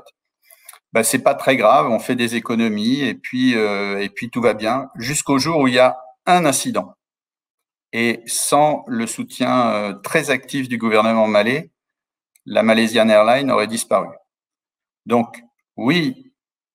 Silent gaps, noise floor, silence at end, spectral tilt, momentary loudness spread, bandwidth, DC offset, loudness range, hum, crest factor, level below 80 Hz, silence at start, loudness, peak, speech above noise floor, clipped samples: 7.50-7.58 s; under -90 dBFS; 0.6 s; -4 dB/octave; 10 LU; 16.5 kHz; under 0.1%; 3 LU; none; 18 dB; -62 dBFS; 0.95 s; -18 LUFS; -2 dBFS; over 73 dB; under 0.1%